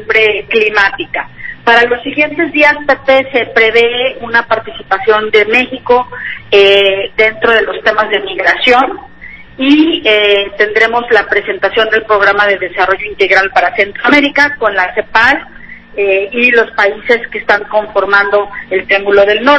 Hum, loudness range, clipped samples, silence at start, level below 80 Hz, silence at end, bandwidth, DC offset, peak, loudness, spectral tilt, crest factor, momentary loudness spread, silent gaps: none; 1 LU; 0.6%; 0 s; -44 dBFS; 0 s; 8 kHz; under 0.1%; 0 dBFS; -10 LUFS; -4 dB/octave; 10 dB; 8 LU; none